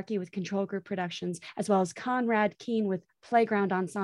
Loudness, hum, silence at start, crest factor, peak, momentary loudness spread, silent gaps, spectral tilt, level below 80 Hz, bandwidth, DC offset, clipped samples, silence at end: -30 LUFS; none; 0 s; 18 dB; -12 dBFS; 9 LU; none; -6 dB/octave; -76 dBFS; 12 kHz; under 0.1%; under 0.1%; 0 s